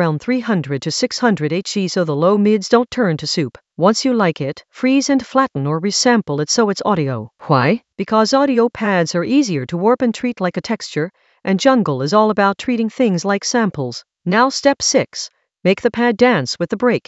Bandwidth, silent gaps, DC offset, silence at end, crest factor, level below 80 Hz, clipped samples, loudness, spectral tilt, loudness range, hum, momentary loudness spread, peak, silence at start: 8.2 kHz; none; under 0.1%; 0.1 s; 16 dB; -58 dBFS; under 0.1%; -17 LUFS; -5 dB/octave; 1 LU; none; 8 LU; 0 dBFS; 0 s